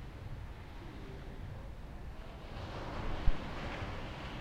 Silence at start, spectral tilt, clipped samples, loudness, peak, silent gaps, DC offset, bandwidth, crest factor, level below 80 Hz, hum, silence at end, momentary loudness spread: 0 s; -6.5 dB/octave; under 0.1%; -44 LUFS; -14 dBFS; none; under 0.1%; 8.4 kHz; 24 dB; -42 dBFS; none; 0 s; 10 LU